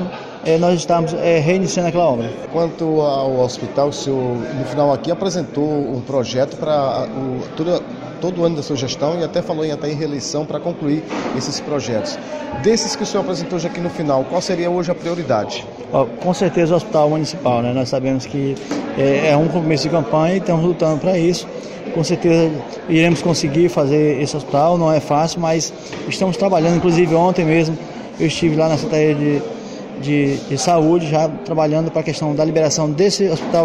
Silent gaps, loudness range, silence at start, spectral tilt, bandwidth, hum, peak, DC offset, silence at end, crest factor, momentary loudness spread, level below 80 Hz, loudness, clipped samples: none; 5 LU; 0 s; -5.5 dB/octave; 12 kHz; none; -2 dBFS; under 0.1%; 0 s; 16 dB; 8 LU; -48 dBFS; -18 LUFS; under 0.1%